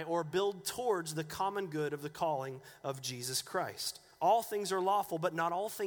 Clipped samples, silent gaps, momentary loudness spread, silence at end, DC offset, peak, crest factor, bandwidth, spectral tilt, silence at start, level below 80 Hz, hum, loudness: under 0.1%; none; 8 LU; 0 s; under 0.1%; -18 dBFS; 16 dB; over 20 kHz; -3.5 dB/octave; 0 s; -74 dBFS; none; -35 LUFS